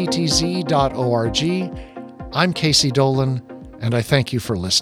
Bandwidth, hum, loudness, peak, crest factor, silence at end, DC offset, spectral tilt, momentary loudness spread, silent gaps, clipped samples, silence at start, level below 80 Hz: 15.5 kHz; none; -19 LUFS; -2 dBFS; 18 dB; 0 s; under 0.1%; -4.5 dB/octave; 14 LU; none; under 0.1%; 0 s; -40 dBFS